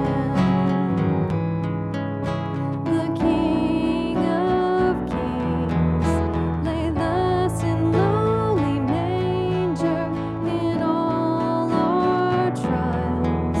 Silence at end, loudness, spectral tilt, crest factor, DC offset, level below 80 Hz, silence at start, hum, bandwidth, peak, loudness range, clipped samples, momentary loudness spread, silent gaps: 0 s; -22 LUFS; -8 dB/octave; 14 dB; under 0.1%; -40 dBFS; 0 s; none; 12 kHz; -8 dBFS; 1 LU; under 0.1%; 5 LU; none